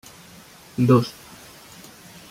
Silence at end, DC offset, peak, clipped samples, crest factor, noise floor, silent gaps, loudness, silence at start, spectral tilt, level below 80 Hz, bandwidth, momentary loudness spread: 1.2 s; under 0.1%; -4 dBFS; under 0.1%; 22 dB; -47 dBFS; none; -20 LUFS; 0.8 s; -7.5 dB/octave; -60 dBFS; 16 kHz; 26 LU